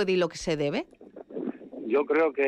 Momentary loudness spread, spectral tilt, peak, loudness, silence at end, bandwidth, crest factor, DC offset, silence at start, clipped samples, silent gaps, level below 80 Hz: 16 LU; -5.5 dB/octave; -14 dBFS; -28 LUFS; 0 s; 10.5 kHz; 14 dB; under 0.1%; 0 s; under 0.1%; none; -58 dBFS